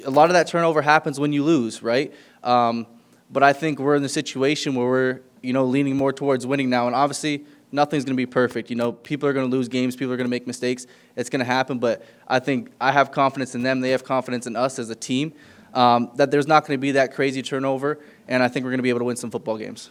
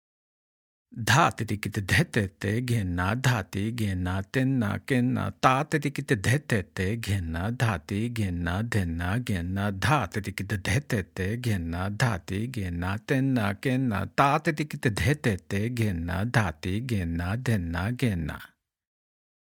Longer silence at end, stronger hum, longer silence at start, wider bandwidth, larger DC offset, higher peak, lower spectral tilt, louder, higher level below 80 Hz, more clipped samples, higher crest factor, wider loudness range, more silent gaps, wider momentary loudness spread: second, 0.05 s vs 0.95 s; neither; second, 0 s vs 0.9 s; second, 14.5 kHz vs 18 kHz; neither; first, 0 dBFS vs -4 dBFS; about the same, -5 dB/octave vs -6 dB/octave; first, -22 LUFS vs -27 LUFS; second, -70 dBFS vs -52 dBFS; neither; about the same, 22 dB vs 24 dB; about the same, 3 LU vs 2 LU; neither; about the same, 10 LU vs 8 LU